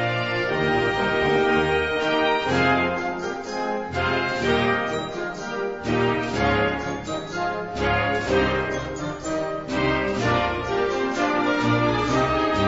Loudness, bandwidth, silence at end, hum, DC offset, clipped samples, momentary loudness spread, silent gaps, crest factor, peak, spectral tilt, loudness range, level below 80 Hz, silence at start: -23 LUFS; 8 kHz; 0 s; none; 0.2%; under 0.1%; 8 LU; none; 14 dB; -8 dBFS; -5.5 dB/octave; 3 LU; -42 dBFS; 0 s